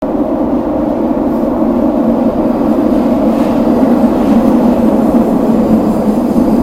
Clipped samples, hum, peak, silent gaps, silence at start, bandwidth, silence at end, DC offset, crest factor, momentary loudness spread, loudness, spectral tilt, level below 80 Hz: under 0.1%; none; 0 dBFS; none; 0 s; 15 kHz; 0 s; under 0.1%; 10 dB; 4 LU; -11 LUFS; -8.5 dB/octave; -32 dBFS